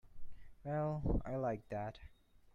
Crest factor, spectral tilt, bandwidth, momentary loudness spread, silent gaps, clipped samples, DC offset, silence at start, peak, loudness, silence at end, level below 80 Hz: 16 dB; -9.5 dB/octave; 7.2 kHz; 11 LU; none; under 0.1%; under 0.1%; 0.05 s; -24 dBFS; -41 LUFS; 0.05 s; -48 dBFS